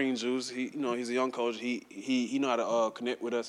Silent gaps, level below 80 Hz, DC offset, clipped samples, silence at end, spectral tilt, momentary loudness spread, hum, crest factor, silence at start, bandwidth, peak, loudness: none; -80 dBFS; under 0.1%; under 0.1%; 0 s; -3.5 dB/octave; 6 LU; none; 16 dB; 0 s; 11.5 kHz; -16 dBFS; -32 LUFS